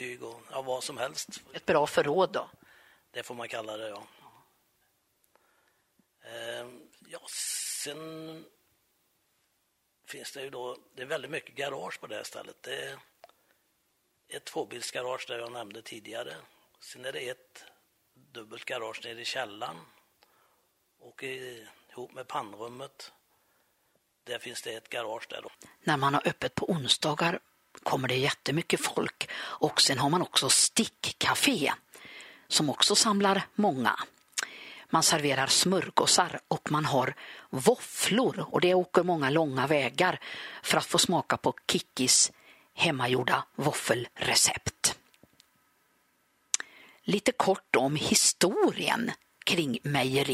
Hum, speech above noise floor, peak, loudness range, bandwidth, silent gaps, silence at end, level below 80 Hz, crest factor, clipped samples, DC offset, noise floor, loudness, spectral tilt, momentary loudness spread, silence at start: none; 46 dB; -4 dBFS; 16 LU; 16 kHz; none; 0 s; -68 dBFS; 26 dB; under 0.1%; under 0.1%; -75 dBFS; -28 LUFS; -2.5 dB/octave; 20 LU; 0 s